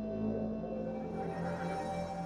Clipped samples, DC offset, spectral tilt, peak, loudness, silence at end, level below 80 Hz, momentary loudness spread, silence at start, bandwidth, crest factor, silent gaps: under 0.1%; under 0.1%; -7.5 dB/octave; -24 dBFS; -38 LUFS; 0 s; -56 dBFS; 3 LU; 0 s; 11 kHz; 12 dB; none